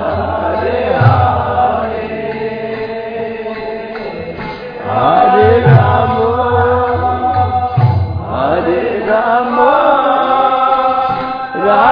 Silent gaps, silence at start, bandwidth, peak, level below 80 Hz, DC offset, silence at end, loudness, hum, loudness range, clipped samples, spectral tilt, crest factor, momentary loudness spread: none; 0 s; 5.2 kHz; 0 dBFS; -36 dBFS; under 0.1%; 0 s; -13 LUFS; none; 7 LU; 0.2%; -10 dB/octave; 12 dB; 13 LU